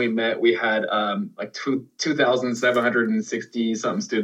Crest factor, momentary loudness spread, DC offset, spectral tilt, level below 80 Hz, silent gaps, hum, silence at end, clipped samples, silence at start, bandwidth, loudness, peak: 16 dB; 7 LU; under 0.1%; -4.5 dB/octave; -86 dBFS; none; none; 0 s; under 0.1%; 0 s; 10.5 kHz; -23 LUFS; -6 dBFS